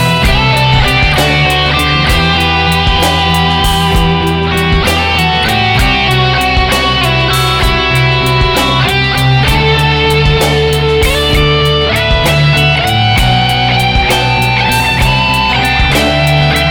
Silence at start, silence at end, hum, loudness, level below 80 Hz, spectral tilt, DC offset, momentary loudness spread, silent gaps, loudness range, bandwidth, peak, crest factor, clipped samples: 0 s; 0 s; none; -9 LUFS; -18 dBFS; -4.5 dB/octave; under 0.1%; 1 LU; none; 1 LU; over 20 kHz; 0 dBFS; 10 dB; under 0.1%